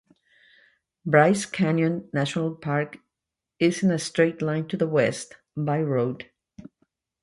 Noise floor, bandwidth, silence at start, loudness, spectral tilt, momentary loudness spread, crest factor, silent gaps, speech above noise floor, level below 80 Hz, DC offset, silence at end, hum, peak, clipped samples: -87 dBFS; 11.5 kHz; 1.05 s; -24 LUFS; -6 dB/octave; 14 LU; 20 dB; none; 63 dB; -66 dBFS; under 0.1%; 0.6 s; none; -4 dBFS; under 0.1%